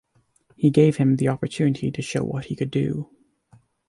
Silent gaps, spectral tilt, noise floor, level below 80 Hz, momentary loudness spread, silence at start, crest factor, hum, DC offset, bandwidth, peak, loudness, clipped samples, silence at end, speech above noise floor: none; -7.5 dB/octave; -62 dBFS; -56 dBFS; 10 LU; 0.6 s; 18 dB; none; under 0.1%; 11.5 kHz; -4 dBFS; -22 LUFS; under 0.1%; 0.85 s; 41 dB